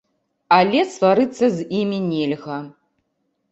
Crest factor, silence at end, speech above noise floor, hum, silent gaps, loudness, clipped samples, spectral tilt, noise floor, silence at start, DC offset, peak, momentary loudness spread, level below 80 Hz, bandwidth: 18 dB; 0.85 s; 53 dB; none; none; -19 LUFS; under 0.1%; -6 dB/octave; -71 dBFS; 0.5 s; under 0.1%; -2 dBFS; 11 LU; -64 dBFS; 8.2 kHz